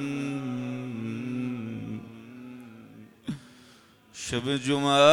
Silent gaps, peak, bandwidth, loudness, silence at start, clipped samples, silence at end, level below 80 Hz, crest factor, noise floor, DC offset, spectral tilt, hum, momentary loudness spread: none; -6 dBFS; 14.5 kHz; -30 LUFS; 0 s; under 0.1%; 0 s; -64 dBFS; 22 dB; -56 dBFS; under 0.1%; -5 dB/octave; none; 20 LU